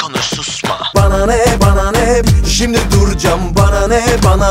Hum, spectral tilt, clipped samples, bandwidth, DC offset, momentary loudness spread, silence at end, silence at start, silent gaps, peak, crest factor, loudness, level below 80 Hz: none; -5 dB/octave; under 0.1%; 16.5 kHz; under 0.1%; 5 LU; 0 s; 0 s; none; 0 dBFS; 10 dB; -12 LUFS; -16 dBFS